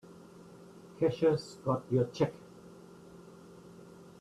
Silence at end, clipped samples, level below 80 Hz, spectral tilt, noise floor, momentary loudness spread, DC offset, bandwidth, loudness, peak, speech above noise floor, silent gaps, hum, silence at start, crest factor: 0.15 s; under 0.1%; -68 dBFS; -7.5 dB/octave; -53 dBFS; 24 LU; under 0.1%; 12.5 kHz; -32 LUFS; -16 dBFS; 23 dB; none; none; 0.1 s; 18 dB